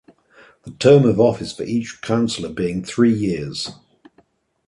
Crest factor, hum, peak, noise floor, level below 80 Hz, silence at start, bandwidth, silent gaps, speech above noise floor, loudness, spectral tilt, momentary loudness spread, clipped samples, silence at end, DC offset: 18 dB; none; -2 dBFS; -59 dBFS; -50 dBFS; 0.65 s; 11.5 kHz; none; 41 dB; -19 LUFS; -6.5 dB/octave; 14 LU; under 0.1%; 0.95 s; under 0.1%